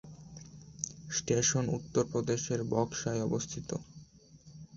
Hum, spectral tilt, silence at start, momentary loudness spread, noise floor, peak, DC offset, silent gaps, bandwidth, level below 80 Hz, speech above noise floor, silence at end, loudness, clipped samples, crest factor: none; -4.5 dB/octave; 0.05 s; 22 LU; -57 dBFS; -14 dBFS; under 0.1%; none; 8 kHz; -60 dBFS; 25 dB; 0 s; -33 LUFS; under 0.1%; 20 dB